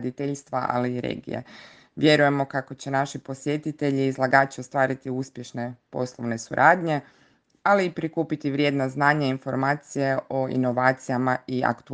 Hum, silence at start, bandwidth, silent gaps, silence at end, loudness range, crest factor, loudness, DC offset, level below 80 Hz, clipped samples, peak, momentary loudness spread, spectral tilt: none; 0 s; 9.8 kHz; none; 0 s; 2 LU; 22 dB; -24 LUFS; under 0.1%; -66 dBFS; under 0.1%; -2 dBFS; 12 LU; -6 dB/octave